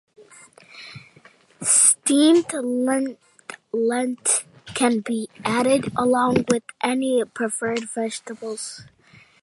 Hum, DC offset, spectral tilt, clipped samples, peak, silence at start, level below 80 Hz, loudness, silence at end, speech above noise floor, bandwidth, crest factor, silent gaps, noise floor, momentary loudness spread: none; under 0.1%; -3 dB/octave; under 0.1%; -2 dBFS; 0.75 s; -62 dBFS; -21 LUFS; 0.6 s; 31 dB; 11.5 kHz; 20 dB; none; -53 dBFS; 19 LU